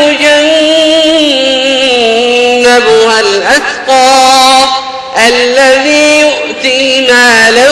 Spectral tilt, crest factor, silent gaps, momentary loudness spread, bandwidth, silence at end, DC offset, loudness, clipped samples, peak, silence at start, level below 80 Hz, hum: -1 dB/octave; 6 dB; none; 5 LU; 16 kHz; 0 s; under 0.1%; -5 LUFS; 0.3%; 0 dBFS; 0 s; -42 dBFS; none